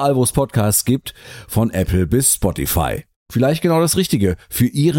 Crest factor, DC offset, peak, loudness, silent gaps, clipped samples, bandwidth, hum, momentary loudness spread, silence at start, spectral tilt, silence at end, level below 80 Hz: 14 dB; under 0.1%; -4 dBFS; -17 LUFS; 3.16-3.26 s; under 0.1%; 17 kHz; none; 8 LU; 0 s; -5 dB/octave; 0 s; -34 dBFS